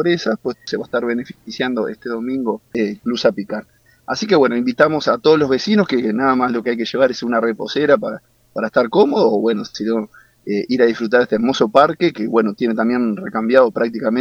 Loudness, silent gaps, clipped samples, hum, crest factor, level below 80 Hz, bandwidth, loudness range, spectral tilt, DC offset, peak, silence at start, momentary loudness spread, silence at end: -17 LUFS; none; under 0.1%; none; 18 dB; -58 dBFS; 7.2 kHz; 5 LU; -6 dB/octave; under 0.1%; 0 dBFS; 0 s; 10 LU; 0 s